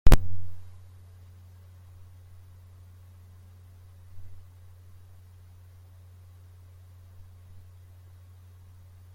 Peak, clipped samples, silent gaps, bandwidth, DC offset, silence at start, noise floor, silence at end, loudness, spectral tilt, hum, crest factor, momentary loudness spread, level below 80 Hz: -2 dBFS; under 0.1%; none; 16.5 kHz; under 0.1%; 0.05 s; -51 dBFS; 4.8 s; -33 LUFS; -6 dB/octave; none; 24 dB; 5 LU; -32 dBFS